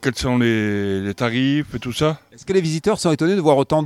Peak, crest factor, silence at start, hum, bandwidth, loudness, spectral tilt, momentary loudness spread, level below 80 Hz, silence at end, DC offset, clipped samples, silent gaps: -2 dBFS; 18 dB; 0 s; none; 15 kHz; -19 LUFS; -6 dB/octave; 6 LU; -44 dBFS; 0 s; under 0.1%; under 0.1%; none